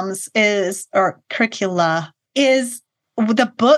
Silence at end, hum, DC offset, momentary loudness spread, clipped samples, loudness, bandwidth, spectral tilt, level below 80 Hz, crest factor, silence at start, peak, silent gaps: 0 s; none; under 0.1%; 9 LU; under 0.1%; -18 LUFS; 12.5 kHz; -4 dB/octave; -76 dBFS; 18 dB; 0 s; 0 dBFS; none